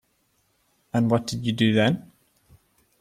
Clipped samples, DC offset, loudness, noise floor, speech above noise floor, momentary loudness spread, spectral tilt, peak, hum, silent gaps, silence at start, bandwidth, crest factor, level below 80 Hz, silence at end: under 0.1%; under 0.1%; -23 LUFS; -69 dBFS; 47 dB; 9 LU; -6 dB/octave; -6 dBFS; none; none; 0.95 s; 14 kHz; 20 dB; -60 dBFS; 1 s